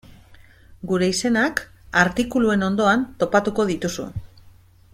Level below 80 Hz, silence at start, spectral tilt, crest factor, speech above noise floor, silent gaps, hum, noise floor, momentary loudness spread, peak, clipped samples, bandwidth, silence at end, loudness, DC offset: -48 dBFS; 0.3 s; -5 dB/octave; 18 dB; 29 dB; none; none; -50 dBFS; 11 LU; -4 dBFS; under 0.1%; 15.5 kHz; 0.55 s; -21 LUFS; under 0.1%